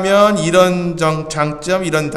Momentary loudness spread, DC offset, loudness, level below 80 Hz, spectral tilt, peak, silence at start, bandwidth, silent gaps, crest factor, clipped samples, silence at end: 7 LU; under 0.1%; -15 LUFS; -44 dBFS; -5 dB/octave; 0 dBFS; 0 s; 14 kHz; none; 14 dB; under 0.1%; 0 s